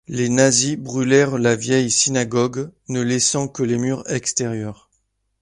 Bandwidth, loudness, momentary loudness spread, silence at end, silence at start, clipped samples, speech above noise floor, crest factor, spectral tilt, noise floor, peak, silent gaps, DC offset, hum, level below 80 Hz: 11.5 kHz; -19 LUFS; 9 LU; 0.7 s; 0.1 s; under 0.1%; 50 dB; 18 dB; -4 dB/octave; -69 dBFS; -2 dBFS; none; under 0.1%; none; -56 dBFS